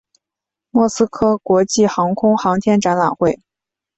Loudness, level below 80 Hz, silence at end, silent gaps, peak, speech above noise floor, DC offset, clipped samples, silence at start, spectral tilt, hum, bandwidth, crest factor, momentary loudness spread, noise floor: -16 LUFS; -52 dBFS; 0.65 s; none; -2 dBFS; 71 dB; under 0.1%; under 0.1%; 0.75 s; -5.5 dB/octave; none; 8.2 kHz; 14 dB; 4 LU; -86 dBFS